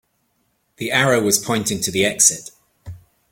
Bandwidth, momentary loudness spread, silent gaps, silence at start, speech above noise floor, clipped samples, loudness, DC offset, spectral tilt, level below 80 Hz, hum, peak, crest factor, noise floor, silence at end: 17 kHz; 9 LU; none; 0.8 s; 49 dB; under 0.1%; -17 LUFS; under 0.1%; -2.5 dB/octave; -54 dBFS; none; 0 dBFS; 22 dB; -67 dBFS; 0.35 s